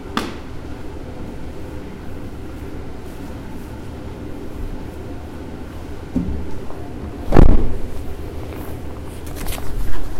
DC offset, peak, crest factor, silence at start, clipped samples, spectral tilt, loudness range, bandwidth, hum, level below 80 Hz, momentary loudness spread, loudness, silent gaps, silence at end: under 0.1%; 0 dBFS; 18 dB; 0 s; under 0.1%; -7 dB/octave; 10 LU; 14.5 kHz; none; -24 dBFS; 12 LU; -27 LUFS; none; 0 s